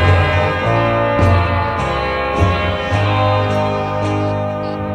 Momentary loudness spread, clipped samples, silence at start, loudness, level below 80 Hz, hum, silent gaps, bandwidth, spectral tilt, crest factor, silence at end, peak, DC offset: 5 LU; under 0.1%; 0 s; -16 LUFS; -30 dBFS; none; none; 9.2 kHz; -7 dB/octave; 14 dB; 0 s; -2 dBFS; under 0.1%